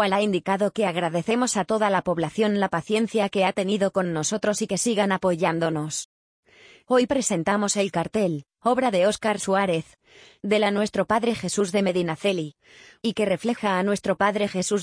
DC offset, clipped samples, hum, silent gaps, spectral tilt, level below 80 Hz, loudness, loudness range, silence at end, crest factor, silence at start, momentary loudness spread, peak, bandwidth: under 0.1%; under 0.1%; none; 6.05-6.43 s; -4.5 dB/octave; -60 dBFS; -24 LUFS; 2 LU; 0 s; 16 dB; 0 s; 4 LU; -8 dBFS; 10.5 kHz